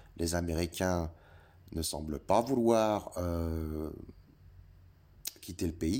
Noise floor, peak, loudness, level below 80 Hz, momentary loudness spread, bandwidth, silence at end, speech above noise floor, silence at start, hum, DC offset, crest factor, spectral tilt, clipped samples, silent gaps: -58 dBFS; -12 dBFS; -33 LUFS; -48 dBFS; 15 LU; 17 kHz; 0 s; 26 dB; 0.15 s; none; under 0.1%; 22 dB; -5.5 dB/octave; under 0.1%; none